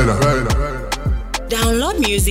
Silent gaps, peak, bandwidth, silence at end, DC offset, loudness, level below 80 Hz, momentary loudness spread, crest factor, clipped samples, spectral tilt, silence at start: none; -4 dBFS; 16.5 kHz; 0 s; under 0.1%; -18 LUFS; -22 dBFS; 7 LU; 14 dB; under 0.1%; -4.5 dB/octave; 0 s